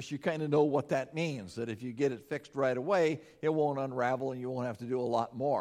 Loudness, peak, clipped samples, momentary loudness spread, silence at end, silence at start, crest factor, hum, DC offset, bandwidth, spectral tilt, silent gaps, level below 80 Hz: -33 LUFS; -14 dBFS; under 0.1%; 9 LU; 0 s; 0 s; 18 dB; none; under 0.1%; 13 kHz; -6.5 dB/octave; none; -74 dBFS